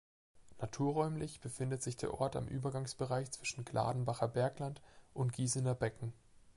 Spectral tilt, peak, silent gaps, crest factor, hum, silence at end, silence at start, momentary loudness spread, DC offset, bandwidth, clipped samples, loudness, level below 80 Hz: -5.5 dB/octave; -20 dBFS; none; 20 dB; none; 0.05 s; 0.35 s; 10 LU; under 0.1%; 11.5 kHz; under 0.1%; -39 LUFS; -64 dBFS